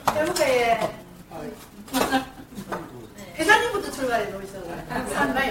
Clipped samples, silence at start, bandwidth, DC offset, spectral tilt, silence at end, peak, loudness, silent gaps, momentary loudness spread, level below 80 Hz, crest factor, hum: under 0.1%; 0 s; 17 kHz; under 0.1%; -3.5 dB/octave; 0 s; -4 dBFS; -24 LUFS; none; 21 LU; -50 dBFS; 22 dB; none